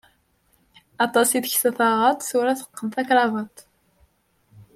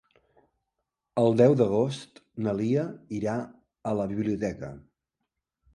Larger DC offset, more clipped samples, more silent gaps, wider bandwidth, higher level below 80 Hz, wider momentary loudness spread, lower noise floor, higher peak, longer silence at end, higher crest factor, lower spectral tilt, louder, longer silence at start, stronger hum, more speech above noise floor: neither; neither; neither; first, 16.5 kHz vs 11 kHz; second, -70 dBFS vs -60 dBFS; second, 10 LU vs 19 LU; second, -64 dBFS vs -84 dBFS; about the same, -6 dBFS vs -8 dBFS; second, 0.15 s vs 0.95 s; about the same, 18 dB vs 20 dB; second, -2.5 dB/octave vs -8 dB/octave; first, -21 LUFS vs -27 LUFS; second, 1 s vs 1.15 s; neither; second, 43 dB vs 58 dB